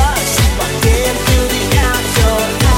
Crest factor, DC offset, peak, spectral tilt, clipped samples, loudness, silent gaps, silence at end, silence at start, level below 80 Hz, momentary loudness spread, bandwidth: 12 dB; under 0.1%; 0 dBFS; -4 dB/octave; under 0.1%; -13 LUFS; none; 0 s; 0 s; -16 dBFS; 1 LU; 17 kHz